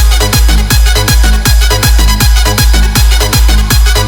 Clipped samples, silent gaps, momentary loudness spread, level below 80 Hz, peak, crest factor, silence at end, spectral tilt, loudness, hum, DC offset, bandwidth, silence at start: 0.5%; none; 1 LU; -8 dBFS; 0 dBFS; 6 dB; 0 s; -3.5 dB/octave; -8 LUFS; none; under 0.1%; 18.5 kHz; 0 s